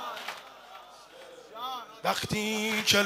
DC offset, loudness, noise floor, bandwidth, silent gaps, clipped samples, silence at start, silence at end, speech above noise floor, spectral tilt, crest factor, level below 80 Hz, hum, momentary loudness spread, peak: under 0.1%; -30 LUFS; -50 dBFS; 16 kHz; none; under 0.1%; 0 s; 0 s; 22 dB; -2.5 dB/octave; 24 dB; -66 dBFS; none; 21 LU; -8 dBFS